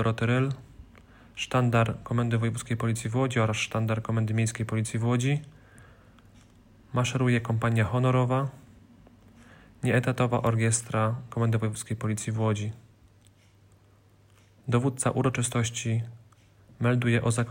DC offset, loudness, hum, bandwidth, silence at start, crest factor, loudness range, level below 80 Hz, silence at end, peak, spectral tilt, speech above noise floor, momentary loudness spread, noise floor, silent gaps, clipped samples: under 0.1%; -27 LUFS; none; 16 kHz; 0 s; 16 dB; 4 LU; -56 dBFS; 0 s; -10 dBFS; -5.5 dB/octave; 33 dB; 8 LU; -59 dBFS; none; under 0.1%